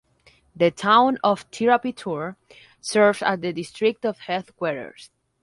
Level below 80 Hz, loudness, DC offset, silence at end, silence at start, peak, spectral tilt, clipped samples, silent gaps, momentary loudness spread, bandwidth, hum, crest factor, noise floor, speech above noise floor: -66 dBFS; -22 LUFS; under 0.1%; 0.35 s; 0.55 s; -4 dBFS; -4.5 dB/octave; under 0.1%; none; 13 LU; 11.5 kHz; none; 20 dB; -58 dBFS; 36 dB